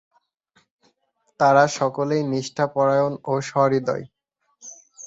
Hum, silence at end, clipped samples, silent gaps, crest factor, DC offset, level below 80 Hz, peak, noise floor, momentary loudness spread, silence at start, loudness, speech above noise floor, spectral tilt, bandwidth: none; 0 s; under 0.1%; none; 18 dB; under 0.1%; -66 dBFS; -4 dBFS; -69 dBFS; 22 LU; 1.4 s; -21 LUFS; 49 dB; -5.5 dB/octave; 8 kHz